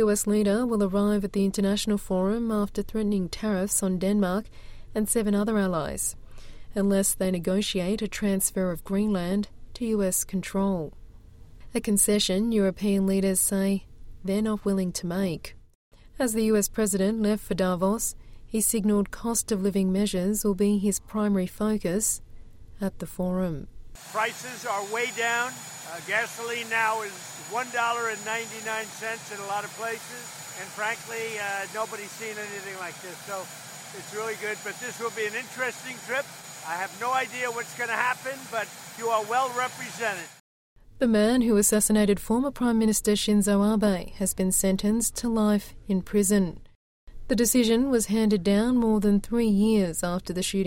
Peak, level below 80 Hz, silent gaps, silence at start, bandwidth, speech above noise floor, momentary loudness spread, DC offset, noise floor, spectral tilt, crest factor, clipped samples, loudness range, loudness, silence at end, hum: -8 dBFS; -46 dBFS; 15.75-15.91 s, 40.40-40.76 s, 46.75-47.07 s; 0 s; 16.5 kHz; 21 dB; 12 LU; under 0.1%; -47 dBFS; -4.5 dB/octave; 18 dB; under 0.1%; 8 LU; -26 LUFS; 0 s; none